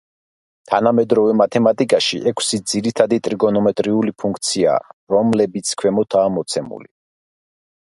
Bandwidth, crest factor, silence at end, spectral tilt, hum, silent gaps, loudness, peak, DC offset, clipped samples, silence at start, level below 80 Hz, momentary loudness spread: 11.5 kHz; 18 dB; 1.1 s; -4.5 dB/octave; none; 4.93-5.07 s; -17 LUFS; 0 dBFS; under 0.1%; under 0.1%; 0.7 s; -58 dBFS; 7 LU